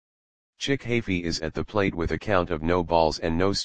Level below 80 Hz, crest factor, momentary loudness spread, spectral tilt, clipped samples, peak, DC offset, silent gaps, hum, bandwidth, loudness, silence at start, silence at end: -42 dBFS; 20 dB; 6 LU; -5.5 dB/octave; under 0.1%; -6 dBFS; 0.9%; none; none; 9.8 kHz; -26 LUFS; 0.5 s; 0 s